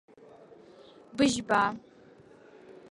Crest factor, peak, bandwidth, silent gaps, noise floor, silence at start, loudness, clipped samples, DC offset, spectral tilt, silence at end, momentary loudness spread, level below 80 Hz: 22 dB; -10 dBFS; 11.5 kHz; none; -55 dBFS; 1.15 s; -27 LUFS; under 0.1%; under 0.1%; -3.5 dB/octave; 0.2 s; 20 LU; -64 dBFS